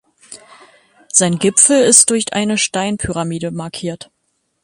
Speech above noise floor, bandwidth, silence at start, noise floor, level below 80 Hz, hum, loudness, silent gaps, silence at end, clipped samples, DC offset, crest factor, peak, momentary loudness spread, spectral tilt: 53 dB; 16 kHz; 0.3 s; -67 dBFS; -46 dBFS; none; -13 LUFS; none; 0.65 s; under 0.1%; under 0.1%; 16 dB; 0 dBFS; 16 LU; -3 dB/octave